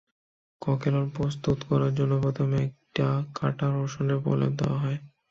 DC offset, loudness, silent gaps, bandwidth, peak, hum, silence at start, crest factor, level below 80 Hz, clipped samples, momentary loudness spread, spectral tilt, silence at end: under 0.1%; -27 LUFS; none; 7.2 kHz; -10 dBFS; none; 0.6 s; 16 dB; -54 dBFS; under 0.1%; 5 LU; -8 dB/octave; 0.25 s